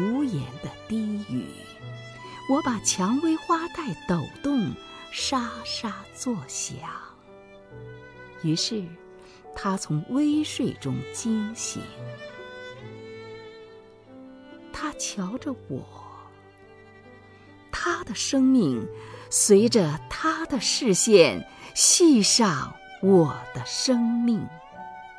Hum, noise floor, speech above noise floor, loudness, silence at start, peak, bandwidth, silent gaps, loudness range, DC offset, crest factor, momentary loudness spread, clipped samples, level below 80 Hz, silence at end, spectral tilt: none; -50 dBFS; 26 dB; -24 LUFS; 0 s; -4 dBFS; 11 kHz; none; 16 LU; under 0.1%; 22 dB; 23 LU; under 0.1%; -56 dBFS; 0 s; -3.5 dB/octave